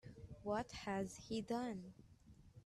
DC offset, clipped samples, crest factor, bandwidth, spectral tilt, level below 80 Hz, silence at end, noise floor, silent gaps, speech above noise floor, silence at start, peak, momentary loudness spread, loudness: under 0.1%; under 0.1%; 16 dB; 13 kHz; -5.5 dB/octave; -68 dBFS; 0.05 s; -65 dBFS; none; 21 dB; 0.05 s; -30 dBFS; 21 LU; -45 LUFS